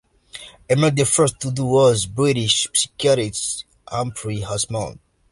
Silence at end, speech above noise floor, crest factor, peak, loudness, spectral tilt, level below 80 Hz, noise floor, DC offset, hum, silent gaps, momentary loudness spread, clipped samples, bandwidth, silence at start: 0.35 s; 22 dB; 16 dB; -4 dBFS; -19 LUFS; -4 dB/octave; -48 dBFS; -41 dBFS; under 0.1%; none; none; 14 LU; under 0.1%; 11.5 kHz; 0.35 s